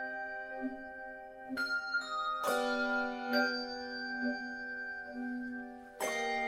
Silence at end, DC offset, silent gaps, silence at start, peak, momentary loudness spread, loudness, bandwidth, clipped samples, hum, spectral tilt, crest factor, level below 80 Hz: 0 s; under 0.1%; none; 0 s; -18 dBFS; 12 LU; -36 LUFS; 16 kHz; under 0.1%; none; -2 dB/octave; 18 dB; -68 dBFS